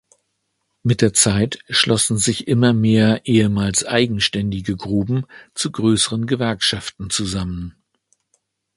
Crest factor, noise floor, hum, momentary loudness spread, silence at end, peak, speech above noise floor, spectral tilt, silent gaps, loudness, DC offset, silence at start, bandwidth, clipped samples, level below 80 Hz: 20 dB; -72 dBFS; none; 10 LU; 1.05 s; 0 dBFS; 54 dB; -4 dB/octave; none; -18 LUFS; under 0.1%; 0.85 s; 11.5 kHz; under 0.1%; -44 dBFS